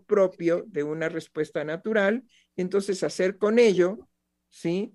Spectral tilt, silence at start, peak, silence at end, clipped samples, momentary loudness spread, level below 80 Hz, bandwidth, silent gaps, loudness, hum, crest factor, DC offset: -5.5 dB/octave; 0.1 s; -8 dBFS; 0.05 s; under 0.1%; 12 LU; -74 dBFS; 12 kHz; none; -26 LUFS; none; 18 dB; under 0.1%